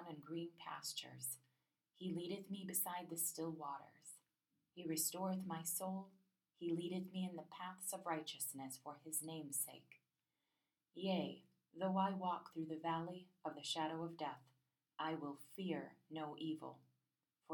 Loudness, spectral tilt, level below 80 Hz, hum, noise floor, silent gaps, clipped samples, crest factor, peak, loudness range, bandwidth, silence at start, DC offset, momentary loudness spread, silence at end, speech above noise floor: -45 LUFS; -4 dB/octave; under -90 dBFS; none; under -90 dBFS; none; under 0.1%; 20 dB; -26 dBFS; 3 LU; 19.5 kHz; 0 s; under 0.1%; 12 LU; 0 s; over 44 dB